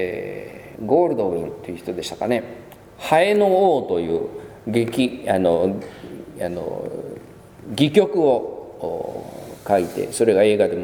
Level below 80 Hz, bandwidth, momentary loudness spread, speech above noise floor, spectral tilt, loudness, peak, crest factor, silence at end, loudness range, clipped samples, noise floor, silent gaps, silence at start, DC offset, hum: -56 dBFS; 19 kHz; 18 LU; 22 dB; -5.5 dB/octave; -20 LUFS; -2 dBFS; 18 dB; 0 s; 4 LU; under 0.1%; -42 dBFS; none; 0 s; under 0.1%; none